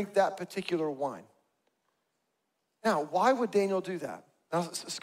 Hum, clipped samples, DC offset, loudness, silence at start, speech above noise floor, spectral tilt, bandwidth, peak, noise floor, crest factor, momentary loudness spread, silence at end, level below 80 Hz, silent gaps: none; under 0.1%; under 0.1%; -31 LUFS; 0 s; 50 dB; -4.5 dB/octave; 16 kHz; -14 dBFS; -81 dBFS; 18 dB; 12 LU; 0 s; -78 dBFS; none